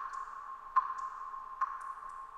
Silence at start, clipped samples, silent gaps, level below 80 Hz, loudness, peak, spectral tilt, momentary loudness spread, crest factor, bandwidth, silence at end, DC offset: 0 s; under 0.1%; none; -68 dBFS; -38 LUFS; -18 dBFS; -1.5 dB/octave; 11 LU; 22 dB; 10.5 kHz; 0 s; under 0.1%